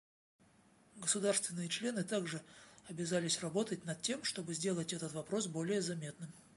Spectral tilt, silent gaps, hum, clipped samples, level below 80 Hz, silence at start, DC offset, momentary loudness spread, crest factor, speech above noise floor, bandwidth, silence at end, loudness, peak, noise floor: -3.5 dB/octave; none; none; under 0.1%; -78 dBFS; 0.95 s; under 0.1%; 12 LU; 20 dB; 29 dB; 11.5 kHz; 0.15 s; -38 LUFS; -20 dBFS; -67 dBFS